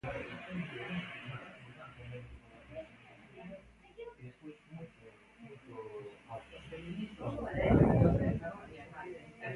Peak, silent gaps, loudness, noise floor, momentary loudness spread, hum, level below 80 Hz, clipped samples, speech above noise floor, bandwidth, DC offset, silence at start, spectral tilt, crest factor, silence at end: -14 dBFS; none; -35 LUFS; -58 dBFS; 25 LU; none; -50 dBFS; under 0.1%; 20 dB; 11 kHz; under 0.1%; 0.05 s; -9 dB/octave; 24 dB; 0 s